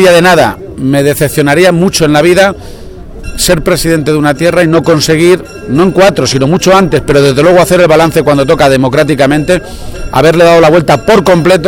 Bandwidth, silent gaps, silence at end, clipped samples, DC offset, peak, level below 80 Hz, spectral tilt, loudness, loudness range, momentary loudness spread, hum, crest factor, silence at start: 19 kHz; none; 0 s; 3%; under 0.1%; 0 dBFS; -28 dBFS; -5 dB/octave; -7 LUFS; 2 LU; 7 LU; none; 6 dB; 0 s